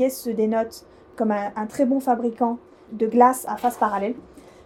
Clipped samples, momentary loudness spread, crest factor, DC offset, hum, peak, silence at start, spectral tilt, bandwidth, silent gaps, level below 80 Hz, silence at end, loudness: under 0.1%; 14 LU; 20 dB; under 0.1%; none; -2 dBFS; 0 s; -5.5 dB/octave; 17 kHz; none; -60 dBFS; 0.25 s; -23 LUFS